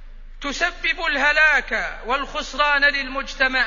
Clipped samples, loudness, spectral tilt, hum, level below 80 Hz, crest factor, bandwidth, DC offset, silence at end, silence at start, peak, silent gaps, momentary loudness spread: under 0.1%; -19 LUFS; -1.5 dB/octave; none; -38 dBFS; 16 dB; 7.4 kHz; under 0.1%; 0 s; 0 s; -4 dBFS; none; 12 LU